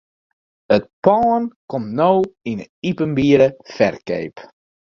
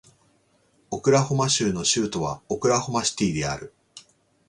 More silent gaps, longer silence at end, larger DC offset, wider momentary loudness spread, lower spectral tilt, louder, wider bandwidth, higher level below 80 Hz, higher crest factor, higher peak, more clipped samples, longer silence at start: first, 0.93-1.02 s, 1.56-1.68 s, 2.69-2.82 s vs none; about the same, 0.5 s vs 0.5 s; neither; first, 12 LU vs 9 LU; first, -7.5 dB/octave vs -4 dB/octave; first, -18 LUFS vs -23 LUFS; second, 7 kHz vs 11.5 kHz; about the same, -54 dBFS vs -52 dBFS; about the same, 18 dB vs 20 dB; first, 0 dBFS vs -6 dBFS; neither; second, 0.7 s vs 0.9 s